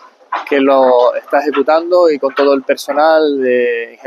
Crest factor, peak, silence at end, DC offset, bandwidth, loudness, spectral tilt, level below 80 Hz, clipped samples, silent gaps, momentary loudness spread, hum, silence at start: 12 dB; 0 dBFS; 0.15 s; under 0.1%; 13.5 kHz; -12 LUFS; -4 dB/octave; -74 dBFS; under 0.1%; none; 6 LU; none; 0.3 s